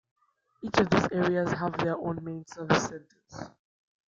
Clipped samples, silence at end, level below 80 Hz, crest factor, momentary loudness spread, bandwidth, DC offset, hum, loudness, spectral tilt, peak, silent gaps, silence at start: under 0.1%; 0.7 s; -60 dBFS; 24 dB; 19 LU; 7.6 kHz; under 0.1%; none; -28 LUFS; -5.5 dB/octave; -6 dBFS; none; 0.6 s